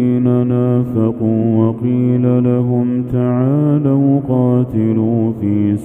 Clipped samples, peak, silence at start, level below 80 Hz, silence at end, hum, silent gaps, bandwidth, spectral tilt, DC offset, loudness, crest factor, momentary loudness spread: under 0.1%; 0 dBFS; 0 s; -46 dBFS; 0 s; none; none; 3.5 kHz; -11.5 dB/octave; under 0.1%; -14 LUFS; 14 dB; 3 LU